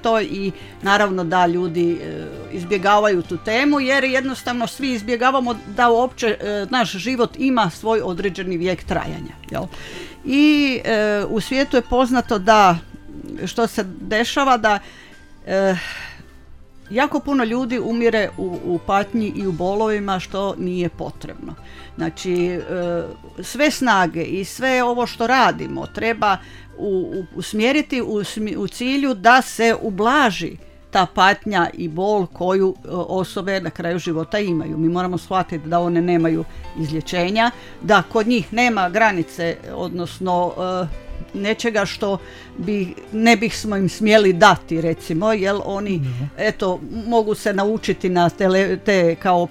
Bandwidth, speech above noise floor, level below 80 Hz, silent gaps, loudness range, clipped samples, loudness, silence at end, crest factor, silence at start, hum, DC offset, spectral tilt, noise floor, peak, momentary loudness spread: 16.5 kHz; 22 dB; -44 dBFS; none; 5 LU; under 0.1%; -19 LUFS; 0 s; 20 dB; 0 s; none; under 0.1%; -5 dB/octave; -41 dBFS; 0 dBFS; 12 LU